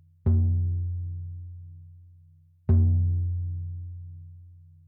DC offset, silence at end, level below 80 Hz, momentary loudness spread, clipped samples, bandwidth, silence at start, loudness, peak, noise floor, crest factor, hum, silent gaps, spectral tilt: under 0.1%; 0.35 s; -46 dBFS; 22 LU; under 0.1%; 1.5 kHz; 0.25 s; -27 LUFS; -10 dBFS; -56 dBFS; 16 dB; none; none; -14.5 dB/octave